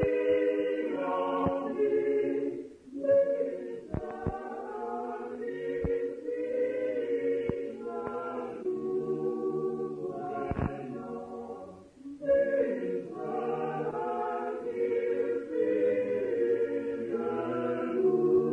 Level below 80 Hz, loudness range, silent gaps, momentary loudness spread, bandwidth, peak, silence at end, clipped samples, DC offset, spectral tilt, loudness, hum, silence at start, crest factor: -56 dBFS; 4 LU; none; 11 LU; 8 kHz; -14 dBFS; 0 s; under 0.1%; under 0.1%; -8.5 dB/octave; -31 LUFS; none; 0 s; 18 dB